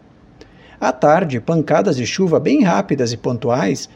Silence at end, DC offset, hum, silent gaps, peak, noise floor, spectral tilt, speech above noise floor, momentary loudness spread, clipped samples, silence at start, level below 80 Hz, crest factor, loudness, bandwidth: 0.1 s; under 0.1%; none; none; 0 dBFS; -45 dBFS; -6 dB/octave; 29 dB; 6 LU; under 0.1%; 0.8 s; -54 dBFS; 16 dB; -17 LUFS; 10.5 kHz